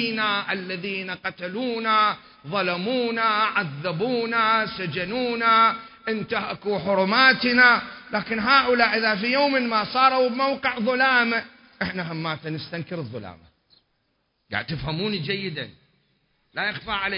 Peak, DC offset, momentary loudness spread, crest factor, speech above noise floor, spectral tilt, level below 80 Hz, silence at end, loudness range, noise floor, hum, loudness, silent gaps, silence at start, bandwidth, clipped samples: -4 dBFS; under 0.1%; 14 LU; 20 dB; 49 dB; -9 dB/octave; -56 dBFS; 0 s; 12 LU; -72 dBFS; none; -22 LUFS; none; 0 s; 5.4 kHz; under 0.1%